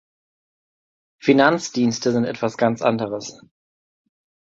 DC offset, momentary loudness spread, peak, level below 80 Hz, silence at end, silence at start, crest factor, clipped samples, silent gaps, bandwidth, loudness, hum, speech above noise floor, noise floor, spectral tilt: under 0.1%; 11 LU; -2 dBFS; -64 dBFS; 1.15 s; 1.25 s; 20 dB; under 0.1%; none; 7.8 kHz; -20 LUFS; none; over 70 dB; under -90 dBFS; -5 dB/octave